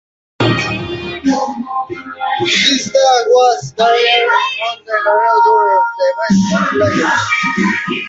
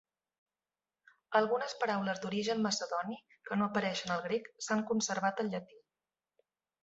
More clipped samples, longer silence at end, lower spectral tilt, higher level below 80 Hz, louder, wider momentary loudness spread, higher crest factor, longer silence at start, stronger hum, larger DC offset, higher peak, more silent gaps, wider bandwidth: neither; second, 0 s vs 1.05 s; about the same, -4 dB/octave vs -3.5 dB/octave; first, -46 dBFS vs -78 dBFS; first, -13 LUFS vs -34 LUFS; first, 10 LU vs 7 LU; second, 14 dB vs 22 dB; second, 0.4 s vs 1.3 s; neither; neither; first, 0 dBFS vs -14 dBFS; neither; about the same, 8 kHz vs 8 kHz